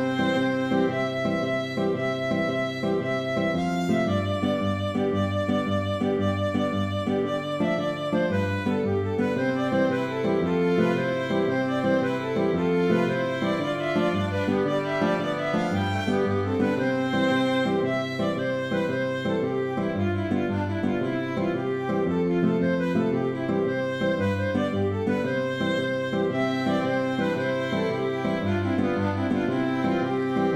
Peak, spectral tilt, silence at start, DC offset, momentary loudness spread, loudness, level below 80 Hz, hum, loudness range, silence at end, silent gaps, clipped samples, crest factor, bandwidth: -10 dBFS; -7 dB/octave; 0 s; under 0.1%; 3 LU; -25 LUFS; -58 dBFS; none; 1 LU; 0 s; none; under 0.1%; 14 dB; 13 kHz